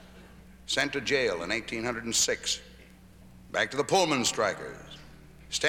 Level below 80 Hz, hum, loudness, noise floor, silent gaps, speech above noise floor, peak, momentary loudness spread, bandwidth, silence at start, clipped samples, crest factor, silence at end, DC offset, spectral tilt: -56 dBFS; none; -28 LUFS; -52 dBFS; none; 23 dB; -10 dBFS; 16 LU; 18 kHz; 0 s; under 0.1%; 20 dB; 0 s; under 0.1%; -2 dB/octave